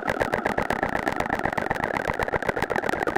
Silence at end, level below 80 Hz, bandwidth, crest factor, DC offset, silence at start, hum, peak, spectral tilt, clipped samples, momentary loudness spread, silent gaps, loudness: 0 s; -44 dBFS; 16.5 kHz; 20 dB; under 0.1%; 0 s; none; -6 dBFS; -5.5 dB/octave; under 0.1%; 1 LU; none; -26 LUFS